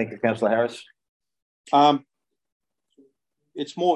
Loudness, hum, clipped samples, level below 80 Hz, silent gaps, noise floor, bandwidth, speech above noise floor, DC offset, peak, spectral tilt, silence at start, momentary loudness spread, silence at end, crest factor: -22 LUFS; none; under 0.1%; -74 dBFS; 1.09-1.20 s, 1.42-1.64 s, 2.52-2.60 s; -69 dBFS; 11 kHz; 47 dB; under 0.1%; -4 dBFS; -5.5 dB/octave; 0 s; 18 LU; 0 s; 20 dB